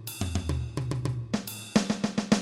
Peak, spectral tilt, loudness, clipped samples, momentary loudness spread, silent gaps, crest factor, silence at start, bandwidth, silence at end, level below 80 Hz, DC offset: -10 dBFS; -5.5 dB/octave; -30 LUFS; under 0.1%; 6 LU; none; 20 dB; 0 s; 16.5 kHz; 0 s; -42 dBFS; under 0.1%